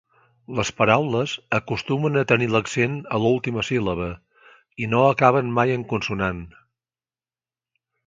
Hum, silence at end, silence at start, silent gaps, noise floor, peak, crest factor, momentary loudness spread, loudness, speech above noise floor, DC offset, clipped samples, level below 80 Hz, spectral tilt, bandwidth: none; 1.55 s; 0.5 s; none; under -90 dBFS; 0 dBFS; 22 dB; 11 LU; -22 LUFS; over 69 dB; under 0.1%; under 0.1%; -50 dBFS; -6 dB/octave; 9.2 kHz